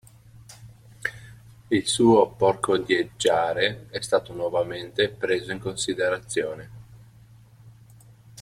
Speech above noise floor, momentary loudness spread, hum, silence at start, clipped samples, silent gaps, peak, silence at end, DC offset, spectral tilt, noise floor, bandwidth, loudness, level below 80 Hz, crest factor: 28 dB; 14 LU; none; 0.5 s; under 0.1%; none; -6 dBFS; 0 s; under 0.1%; -4 dB/octave; -51 dBFS; 14.5 kHz; -24 LUFS; -58 dBFS; 20 dB